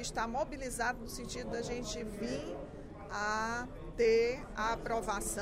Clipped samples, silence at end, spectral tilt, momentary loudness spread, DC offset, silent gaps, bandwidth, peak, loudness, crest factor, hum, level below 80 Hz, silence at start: under 0.1%; 0 s; -3.5 dB/octave; 13 LU; under 0.1%; none; 16 kHz; -20 dBFS; -36 LUFS; 16 dB; none; -50 dBFS; 0 s